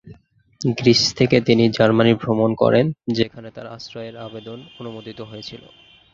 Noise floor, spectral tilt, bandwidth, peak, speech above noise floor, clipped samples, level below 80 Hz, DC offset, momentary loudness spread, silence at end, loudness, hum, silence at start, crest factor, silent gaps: -49 dBFS; -5.5 dB/octave; 7.6 kHz; -2 dBFS; 29 dB; under 0.1%; -52 dBFS; under 0.1%; 19 LU; 0.55 s; -17 LUFS; none; 0.05 s; 18 dB; none